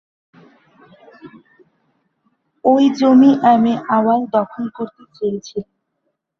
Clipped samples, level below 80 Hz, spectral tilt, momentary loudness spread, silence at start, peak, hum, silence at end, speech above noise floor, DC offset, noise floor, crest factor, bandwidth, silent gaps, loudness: under 0.1%; -62 dBFS; -7 dB/octave; 18 LU; 1.25 s; -2 dBFS; none; 0.8 s; 57 dB; under 0.1%; -72 dBFS; 16 dB; 6.6 kHz; none; -15 LUFS